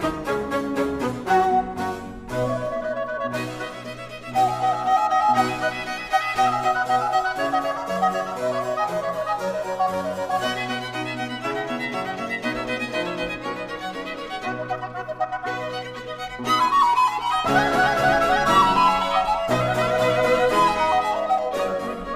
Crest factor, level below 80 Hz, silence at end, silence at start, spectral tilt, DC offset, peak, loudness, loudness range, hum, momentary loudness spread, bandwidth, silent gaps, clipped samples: 16 dB; -48 dBFS; 0 s; 0 s; -4.5 dB/octave; under 0.1%; -6 dBFS; -23 LUFS; 9 LU; none; 11 LU; 15.5 kHz; none; under 0.1%